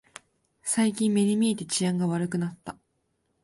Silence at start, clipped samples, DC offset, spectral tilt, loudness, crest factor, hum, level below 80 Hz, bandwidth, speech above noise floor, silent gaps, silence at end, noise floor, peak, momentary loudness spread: 0.65 s; under 0.1%; under 0.1%; -5 dB/octave; -26 LUFS; 14 dB; none; -68 dBFS; 11.5 kHz; 49 dB; none; 0.7 s; -74 dBFS; -14 dBFS; 12 LU